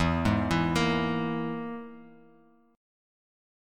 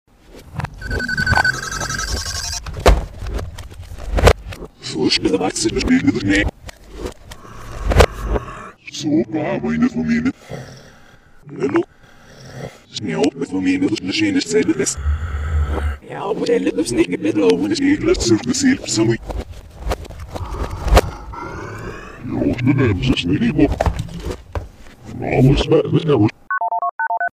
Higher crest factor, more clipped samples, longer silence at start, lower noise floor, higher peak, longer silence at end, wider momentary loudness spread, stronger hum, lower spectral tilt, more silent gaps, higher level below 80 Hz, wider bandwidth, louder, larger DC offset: about the same, 18 dB vs 18 dB; neither; second, 0 s vs 0.3 s; first, -60 dBFS vs -45 dBFS; second, -12 dBFS vs 0 dBFS; first, 0.95 s vs 0.05 s; second, 14 LU vs 18 LU; neither; about the same, -6 dB/octave vs -5 dB/octave; second, none vs 26.91-26.99 s; second, -46 dBFS vs -28 dBFS; second, 13 kHz vs 15.5 kHz; second, -28 LUFS vs -18 LUFS; neither